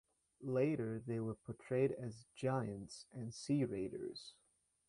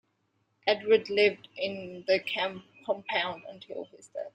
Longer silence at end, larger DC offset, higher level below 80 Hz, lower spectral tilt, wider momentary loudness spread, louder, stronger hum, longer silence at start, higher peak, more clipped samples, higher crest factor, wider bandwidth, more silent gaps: first, 0.6 s vs 0.05 s; neither; about the same, -72 dBFS vs -76 dBFS; first, -7 dB/octave vs -4.5 dB/octave; second, 13 LU vs 17 LU; second, -41 LUFS vs -29 LUFS; neither; second, 0.4 s vs 0.65 s; second, -24 dBFS vs -10 dBFS; neither; about the same, 18 dB vs 22 dB; first, 11 kHz vs 9.2 kHz; neither